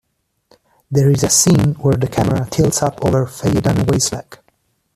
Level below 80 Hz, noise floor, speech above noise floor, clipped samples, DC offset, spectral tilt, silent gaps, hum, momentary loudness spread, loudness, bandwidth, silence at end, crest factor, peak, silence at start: -40 dBFS; -62 dBFS; 47 dB; under 0.1%; under 0.1%; -5 dB/octave; none; none; 6 LU; -15 LUFS; 14.5 kHz; 0.6 s; 16 dB; 0 dBFS; 0.9 s